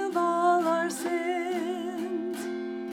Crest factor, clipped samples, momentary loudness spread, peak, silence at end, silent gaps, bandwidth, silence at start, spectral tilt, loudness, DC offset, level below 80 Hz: 14 dB; under 0.1%; 10 LU; -14 dBFS; 0 s; none; 16.5 kHz; 0 s; -4 dB/octave; -28 LUFS; under 0.1%; -80 dBFS